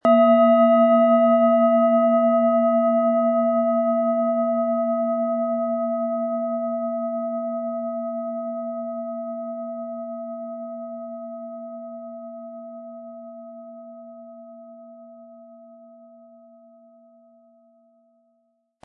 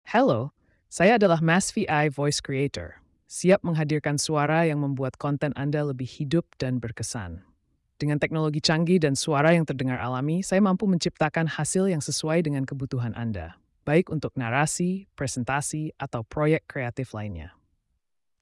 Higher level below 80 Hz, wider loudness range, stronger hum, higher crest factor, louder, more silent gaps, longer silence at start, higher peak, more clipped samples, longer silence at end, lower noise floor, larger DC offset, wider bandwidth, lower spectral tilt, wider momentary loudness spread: second, -84 dBFS vs -56 dBFS; first, 23 LU vs 5 LU; neither; about the same, 16 dB vs 16 dB; first, -21 LUFS vs -25 LUFS; neither; about the same, 0.05 s vs 0.05 s; first, -6 dBFS vs -10 dBFS; neither; first, 3.1 s vs 0.95 s; second, -69 dBFS vs -75 dBFS; neither; second, 3.9 kHz vs 12 kHz; first, -9 dB/octave vs -5.5 dB/octave; first, 23 LU vs 11 LU